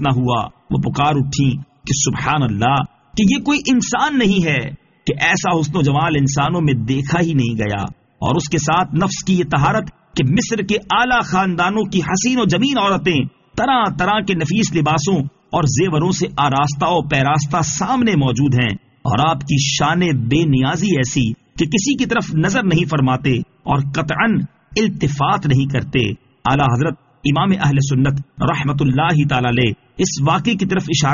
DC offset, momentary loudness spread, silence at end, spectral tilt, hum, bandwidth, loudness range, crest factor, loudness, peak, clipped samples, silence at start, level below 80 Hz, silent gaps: under 0.1%; 6 LU; 0 s; -5 dB/octave; none; 7.4 kHz; 1 LU; 14 dB; -17 LUFS; -2 dBFS; under 0.1%; 0 s; -42 dBFS; none